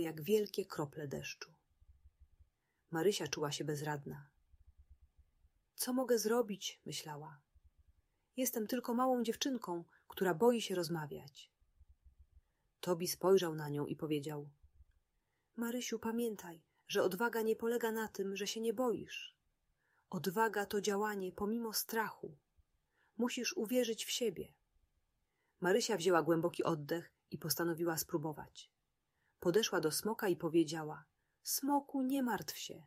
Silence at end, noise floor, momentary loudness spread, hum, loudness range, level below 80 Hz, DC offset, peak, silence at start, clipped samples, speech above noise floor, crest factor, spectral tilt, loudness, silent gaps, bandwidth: 0.05 s; -84 dBFS; 16 LU; none; 5 LU; -74 dBFS; under 0.1%; -18 dBFS; 0 s; under 0.1%; 47 dB; 22 dB; -4 dB/octave; -37 LUFS; none; 16 kHz